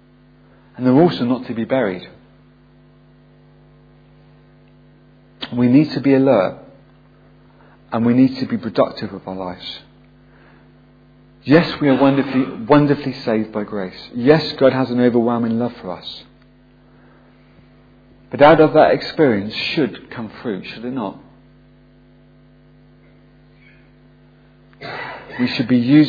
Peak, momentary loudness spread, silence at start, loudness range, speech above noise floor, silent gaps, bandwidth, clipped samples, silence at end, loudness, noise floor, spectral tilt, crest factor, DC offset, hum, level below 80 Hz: 0 dBFS; 17 LU; 0.8 s; 12 LU; 33 dB; none; 5 kHz; under 0.1%; 0 s; -17 LUFS; -49 dBFS; -8.5 dB/octave; 20 dB; under 0.1%; none; -54 dBFS